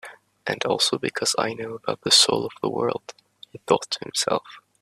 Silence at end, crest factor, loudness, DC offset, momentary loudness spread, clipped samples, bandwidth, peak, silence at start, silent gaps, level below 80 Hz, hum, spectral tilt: 0.2 s; 22 dB; -22 LUFS; under 0.1%; 15 LU; under 0.1%; 15 kHz; -2 dBFS; 0.05 s; none; -68 dBFS; none; -2 dB/octave